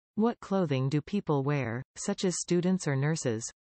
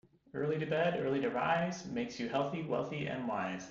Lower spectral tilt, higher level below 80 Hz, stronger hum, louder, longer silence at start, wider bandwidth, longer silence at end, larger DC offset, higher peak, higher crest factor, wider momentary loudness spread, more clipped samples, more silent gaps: about the same, -5.5 dB/octave vs -5 dB/octave; about the same, -66 dBFS vs -70 dBFS; neither; first, -30 LUFS vs -35 LUFS; second, 0.15 s vs 0.35 s; first, 8.8 kHz vs 7.8 kHz; first, 0.2 s vs 0 s; neither; first, -16 dBFS vs -20 dBFS; about the same, 14 dB vs 16 dB; about the same, 6 LU vs 6 LU; neither; first, 1.85-1.94 s vs none